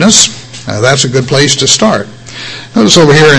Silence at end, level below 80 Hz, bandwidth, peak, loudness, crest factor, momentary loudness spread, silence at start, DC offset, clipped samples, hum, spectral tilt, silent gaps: 0 s; -38 dBFS; 11 kHz; 0 dBFS; -7 LUFS; 8 dB; 17 LU; 0 s; under 0.1%; 4%; none; -3 dB/octave; none